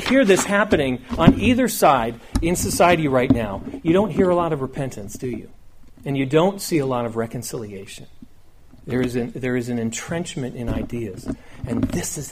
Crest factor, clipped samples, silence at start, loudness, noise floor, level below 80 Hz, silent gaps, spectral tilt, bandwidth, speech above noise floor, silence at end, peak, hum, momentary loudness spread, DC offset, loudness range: 20 dB; under 0.1%; 0 s; -21 LUFS; -45 dBFS; -38 dBFS; none; -5.5 dB/octave; 15.5 kHz; 24 dB; 0 s; 0 dBFS; none; 14 LU; under 0.1%; 9 LU